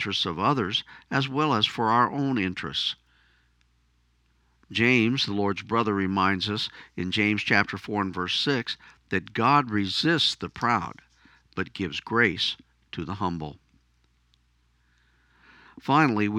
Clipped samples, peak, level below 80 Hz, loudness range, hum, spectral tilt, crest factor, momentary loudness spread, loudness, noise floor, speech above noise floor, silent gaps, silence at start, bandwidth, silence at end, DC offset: under 0.1%; -4 dBFS; -60 dBFS; 5 LU; 60 Hz at -55 dBFS; -5 dB/octave; 22 dB; 13 LU; -25 LUFS; -66 dBFS; 41 dB; none; 0 s; 11.5 kHz; 0 s; under 0.1%